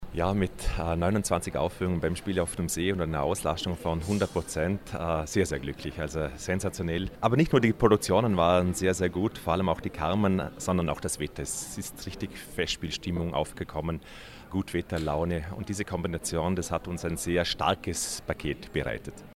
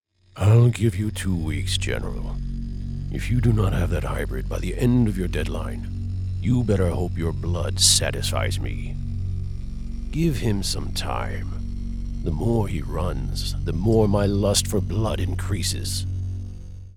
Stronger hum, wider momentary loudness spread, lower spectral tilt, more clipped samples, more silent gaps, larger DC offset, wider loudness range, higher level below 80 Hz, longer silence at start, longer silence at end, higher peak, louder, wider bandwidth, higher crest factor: neither; second, 10 LU vs 13 LU; about the same, -5 dB/octave vs -5 dB/octave; neither; neither; neither; about the same, 7 LU vs 5 LU; second, -44 dBFS vs -30 dBFS; second, 0 s vs 0.35 s; about the same, 0 s vs 0 s; second, -8 dBFS vs -2 dBFS; second, -29 LUFS vs -24 LUFS; about the same, 16 kHz vs 17 kHz; about the same, 22 dB vs 20 dB